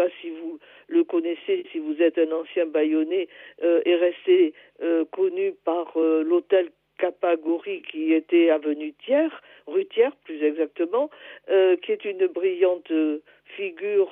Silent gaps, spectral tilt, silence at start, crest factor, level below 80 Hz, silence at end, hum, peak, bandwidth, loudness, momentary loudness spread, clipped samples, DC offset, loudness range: none; -7.5 dB/octave; 0 s; 16 dB; -82 dBFS; 0 s; none; -8 dBFS; 3.8 kHz; -24 LUFS; 12 LU; under 0.1%; under 0.1%; 2 LU